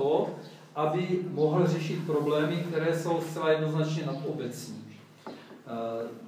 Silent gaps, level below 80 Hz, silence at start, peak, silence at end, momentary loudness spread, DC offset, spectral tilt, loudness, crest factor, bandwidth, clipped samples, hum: none; -82 dBFS; 0 s; -12 dBFS; 0 s; 18 LU; under 0.1%; -7 dB/octave; -29 LUFS; 18 dB; 16 kHz; under 0.1%; none